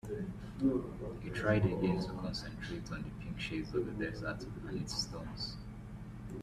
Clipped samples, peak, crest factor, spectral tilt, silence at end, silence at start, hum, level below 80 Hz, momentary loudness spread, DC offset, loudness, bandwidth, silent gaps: under 0.1%; -18 dBFS; 20 dB; -6 dB/octave; 0 s; 0.05 s; none; -52 dBFS; 11 LU; under 0.1%; -38 LUFS; 13.5 kHz; none